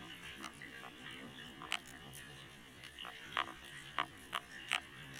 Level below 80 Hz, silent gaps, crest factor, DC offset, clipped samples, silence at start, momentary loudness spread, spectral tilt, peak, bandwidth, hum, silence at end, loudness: -70 dBFS; none; 30 dB; under 0.1%; under 0.1%; 0 s; 12 LU; -2 dB/octave; -16 dBFS; 16.5 kHz; none; 0 s; -45 LUFS